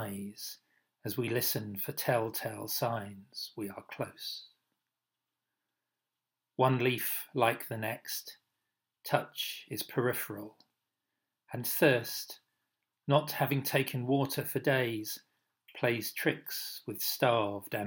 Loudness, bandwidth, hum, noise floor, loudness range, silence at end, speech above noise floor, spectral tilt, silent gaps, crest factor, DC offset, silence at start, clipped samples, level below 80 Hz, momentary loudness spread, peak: -33 LUFS; 18 kHz; none; -89 dBFS; 7 LU; 0 s; 56 dB; -4.5 dB/octave; none; 24 dB; under 0.1%; 0 s; under 0.1%; -82 dBFS; 15 LU; -10 dBFS